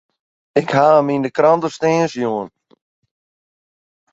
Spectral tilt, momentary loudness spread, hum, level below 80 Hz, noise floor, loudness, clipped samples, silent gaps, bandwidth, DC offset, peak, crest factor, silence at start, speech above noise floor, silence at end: -6 dB/octave; 9 LU; none; -62 dBFS; under -90 dBFS; -16 LUFS; under 0.1%; none; 8 kHz; under 0.1%; -2 dBFS; 16 dB; 0.55 s; over 75 dB; 1.65 s